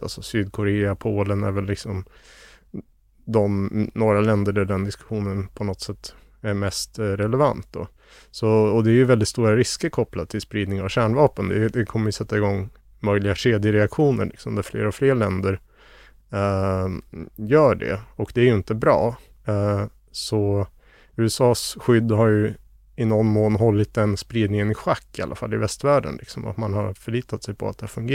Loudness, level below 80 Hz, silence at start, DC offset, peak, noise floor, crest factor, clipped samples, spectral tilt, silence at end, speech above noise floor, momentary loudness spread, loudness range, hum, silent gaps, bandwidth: -22 LUFS; -48 dBFS; 0 s; under 0.1%; -2 dBFS; -50 dBFS; 18 dB; under 0.1%; -6.5 dB/octave; 0 s; 28 dB; 13 LU; 5 LU; none; none; 14.5 kHz